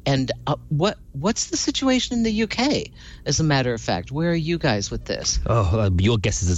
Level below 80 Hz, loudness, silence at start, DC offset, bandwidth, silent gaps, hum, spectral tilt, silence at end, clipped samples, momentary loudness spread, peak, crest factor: -36 dBFS; -22 LUFS; 0.05 s; under 0.1%; 8.4 kHz; none; none; -4.5 dB/octave; 0 s; under 0.1%; 6 LU; -8 dBFS; 12 dB